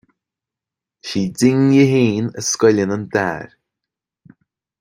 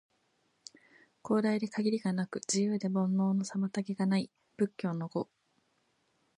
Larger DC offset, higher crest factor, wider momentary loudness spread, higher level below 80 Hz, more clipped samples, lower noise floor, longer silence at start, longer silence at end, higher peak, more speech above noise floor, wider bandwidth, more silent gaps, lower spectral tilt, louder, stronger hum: neither; about the same, 16 dB vs 16 dB; second, 12 LU vs 15 LU; first, -56 dBFS vs -80 dBFS; neither; first, -86 dBFS vs -75 dBFS; second, 1.05 s vs 1.25 s; first, 1.35 s vs 1.15 s; first, -2 dBFS vs -18 dBFS; first, 71 dB vs 44 dB; first, 16 kHz vs 10.5 kHz; neither; about the same, -5.5 dB/octave vs -6 dB/octave; first, -16 LUFS vs -32 LUFS; neither